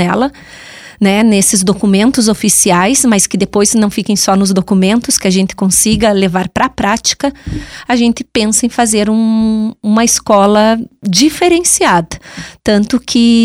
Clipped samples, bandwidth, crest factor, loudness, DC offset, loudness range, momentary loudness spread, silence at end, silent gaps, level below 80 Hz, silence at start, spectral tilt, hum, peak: under 0.1%; 16 kHz; 10 dB; -10 LUFS; under 0.1%; 3 LU; 7 LU; 0 s; none; -38 dBFS; 0 s; -3.5 dB/octave; none; 0 dBFS